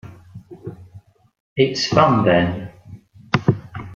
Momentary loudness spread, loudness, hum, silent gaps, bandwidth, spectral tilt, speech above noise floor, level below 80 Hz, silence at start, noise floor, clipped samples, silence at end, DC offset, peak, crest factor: 22 LU; -18 LUFS; none; 1.40-1.56 s; 7.8 kHz; -6 dB/octave; 30 dB; -50 dBFS; 0.05 s; -46 dBFS; under 0.1%; 0 s; under 0.1%; -2 dBFS; 20 dB